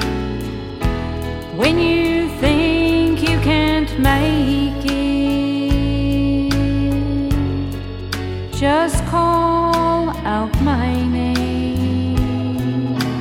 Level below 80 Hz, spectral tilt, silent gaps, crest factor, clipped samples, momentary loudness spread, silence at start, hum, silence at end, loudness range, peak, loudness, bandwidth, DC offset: -26 dBFS; -6.5 dB/octave; none; 16 dB; under 0.1%; 9 LU; 0 s; none; 0 s; 3 LU; -2 dBFS; -18 LUFS; 16.5 kHz; under 0.1%